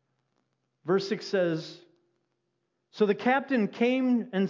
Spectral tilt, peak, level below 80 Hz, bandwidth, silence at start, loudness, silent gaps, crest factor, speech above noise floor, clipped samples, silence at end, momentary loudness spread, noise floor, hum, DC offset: -6.5 dB/octave; -12 dBFS; -88 dBFS; 7.6 kHz; 0.85 s; -27 LUFS; none; 18 dB; 52 dB; under 0.1%; 0 s; 8 LU; -79 dBFS; none; under 0.1%